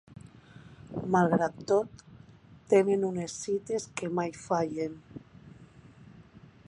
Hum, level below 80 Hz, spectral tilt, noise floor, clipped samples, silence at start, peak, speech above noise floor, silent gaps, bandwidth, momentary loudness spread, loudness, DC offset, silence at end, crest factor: none; -64 dBFS; -6 dB/octave; -54 dBFS; under 0.1%; 0.1 s; -10 dBFS; 26 dB; none; 10.5 kHz; 24 LU; -29 LUFS; under 0.1%; 0.3 s; 20 dB